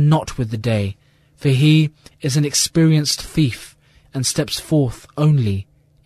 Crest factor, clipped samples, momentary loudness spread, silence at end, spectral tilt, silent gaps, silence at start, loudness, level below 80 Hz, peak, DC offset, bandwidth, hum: 14 dB; under 0.1%; 10 LU; 0.45 s; -5 dB/octave; none; 0 s; -18 LUFS; -44 dBFS; -4 dBFS; under 0.1%; 13.5 kHz; none